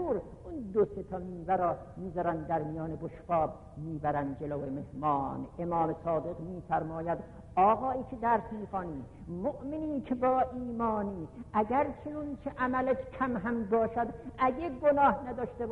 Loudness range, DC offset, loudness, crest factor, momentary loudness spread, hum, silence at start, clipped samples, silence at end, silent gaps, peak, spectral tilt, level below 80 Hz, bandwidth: 3 LU; under 0.1%; -32 LUFS; 18 dB; 11 LU; none; 0 s; under 0.1%; 0 s; none; -14 dBFS; -9.5 dB/octave; -54 dBFS; 10 kHz